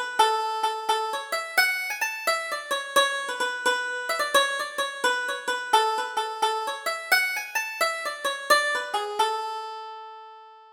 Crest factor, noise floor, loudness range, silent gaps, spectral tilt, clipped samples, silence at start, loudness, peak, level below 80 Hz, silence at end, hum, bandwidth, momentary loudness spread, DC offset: 20 dB; -47 dBFS; 1 LU; none; 1.5 dB/octave; under 0.1%; 0 s; -25 LUFS; -6 dBFS; -72 dBFS; 0 s; none; over 20 kHz; 8 LU; under 0.1%